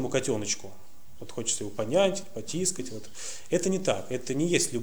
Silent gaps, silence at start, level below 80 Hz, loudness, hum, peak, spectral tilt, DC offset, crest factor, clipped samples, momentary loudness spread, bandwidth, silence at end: none; 0 s; -62 dBFS; -29 LUFS; none; -10 dBFS; -3.5 dB/octave; 1%; 20 dB; under 0.1%; 13 LU; over 20 kHz; 0 s